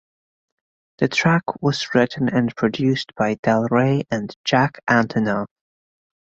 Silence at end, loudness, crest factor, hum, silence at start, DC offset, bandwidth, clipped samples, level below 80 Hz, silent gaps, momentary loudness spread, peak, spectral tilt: 0.95 s; -20 LUFS; 18 dB; none; 1 s; under 0.1%; 7.8 kHz; under 0.1%; -56 dBFS; 3.39-3.43 s, 4.36-4.44 s; 6 LU; -2 dBFS; -6 dB/octave